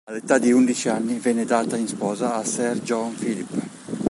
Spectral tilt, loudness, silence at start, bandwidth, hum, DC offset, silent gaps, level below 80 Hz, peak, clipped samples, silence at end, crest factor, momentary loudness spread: -4.5 dB/octave; -22 LUFS; 0.05 s; 11.5 kHz; none; under 0.1%; none; -62 dBFS; -2 dBFS; under 0.1%; 0 s; 20 dB; 10 LU